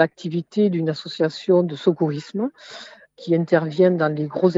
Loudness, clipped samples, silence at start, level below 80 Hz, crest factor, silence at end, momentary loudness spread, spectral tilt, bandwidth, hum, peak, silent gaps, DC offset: -21 LUFS; under 0.1%; 0 s; -72 dBFS; 18 dB; 0 s; 11 LU; -7.5 dB/octave; 7.8 kHz; none; -2 dBFS; none; under 0.1%